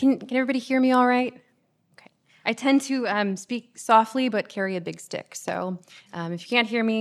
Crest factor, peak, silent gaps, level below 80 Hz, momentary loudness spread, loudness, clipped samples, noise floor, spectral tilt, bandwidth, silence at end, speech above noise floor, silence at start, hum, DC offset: 20 dB; -4 dBFS; none; -82 dBFS; 14 LU; -24 LUFS; under 0.1%; -66 dBFS; -4.5 dB/octave; 13 kHz; 0 s; 43 dB; 0 s; none; under 0.1%